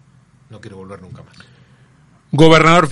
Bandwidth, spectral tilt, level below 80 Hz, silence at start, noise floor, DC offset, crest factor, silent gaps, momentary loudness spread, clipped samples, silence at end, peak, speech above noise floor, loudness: 11.5 kHz; -5.5 dB/octave; -42 dBFS; 0.5 s; -50 dBFS; under 0.1%; 16 dB; none; 27 LU; under 0.1%; 0 s; 0 dBFS; 37 dB; -10 LUFS